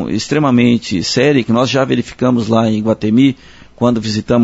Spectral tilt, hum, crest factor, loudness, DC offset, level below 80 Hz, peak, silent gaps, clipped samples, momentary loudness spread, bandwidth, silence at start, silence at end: -6 dB/octave; none; 14 dB; -14 LUFS; under 0.1%; -46 dBFS; 0 dBFS; none; under 0.1%; 5 LU; 8 kHz; 0 s; 0 s